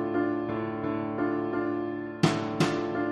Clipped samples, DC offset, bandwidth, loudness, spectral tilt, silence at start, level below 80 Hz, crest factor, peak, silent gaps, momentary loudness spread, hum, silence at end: under 0.1%; under 0.1%; 12 kHz; -29 LUFS; -6.5 dB/octave; 0 s; -62 dBFS; 22 dB; -8 dBFS; none; 5 LU; none; 0 s